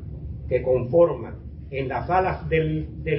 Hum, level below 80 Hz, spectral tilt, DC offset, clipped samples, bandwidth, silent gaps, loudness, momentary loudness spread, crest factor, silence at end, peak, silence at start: none; -38 dBFS; -12 dB/octave; under 0.1%; under 0.1%; 5.6 kHz; none; -23 LUFS; 16 LU; 18 dB; 0 s; -6 dBFS; 0 s